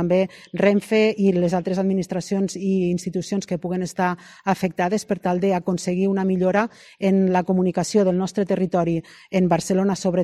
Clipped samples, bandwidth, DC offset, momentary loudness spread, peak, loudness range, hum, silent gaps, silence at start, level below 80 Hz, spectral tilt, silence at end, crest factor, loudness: under 0.1%; 12.5 kHz; under 0.1%; 7 LU; -2 dBFS; 3 LU; none; none; 0 s; -56 dBFS; -6.5 dB/octave; 0 s; 18 dB; -22 LUFS